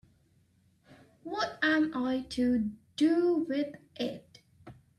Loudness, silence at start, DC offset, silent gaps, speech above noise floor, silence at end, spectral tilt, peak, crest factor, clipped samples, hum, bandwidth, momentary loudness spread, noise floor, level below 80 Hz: -30 LUFS; 0.9 s; under 0.1%; none; 38 dB; 0.25 s; -5 dB/octave; -16 dBFS; 16 dB; under 0.1%; none; 11.5 kHz; 12 LU; -67 dBFS; -64 dBFS